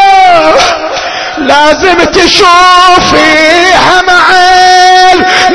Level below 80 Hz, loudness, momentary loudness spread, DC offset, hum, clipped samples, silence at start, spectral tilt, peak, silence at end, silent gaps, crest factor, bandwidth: -30 dBFS; -3 LUFS; 6 LU; under 0.1%; none; 10%; 0 s; -2 dB/octave; 0 dBFS; 0 s; none; 4 dB; 11 kHz